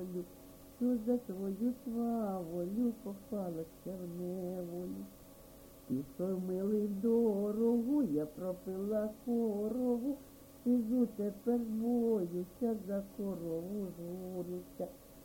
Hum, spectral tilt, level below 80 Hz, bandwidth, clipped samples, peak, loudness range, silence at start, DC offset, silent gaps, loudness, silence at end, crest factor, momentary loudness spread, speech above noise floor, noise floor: none; -8.5 dB/octave; -66 dBFS; 17 kHz; under 0.1%; -22 dBFS; 7 LU; 0 s; under 0.1%; none; -37 LUFS; 0 s; 16 dB; 13 LU; 20 dB; -56 dBFS